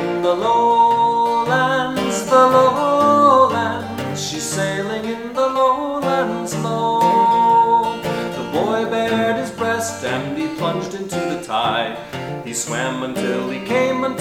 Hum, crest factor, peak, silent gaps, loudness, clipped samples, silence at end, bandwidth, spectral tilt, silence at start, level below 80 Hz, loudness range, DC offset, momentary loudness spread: none; 16 dB; 0 dBFS; none; -18 LUFS; under 0.1%; 0 s; 16.5 kHz; -4.5 dB/octave; 0 s; -54 dBFS; 7 LU; under 0.1%; 11 LU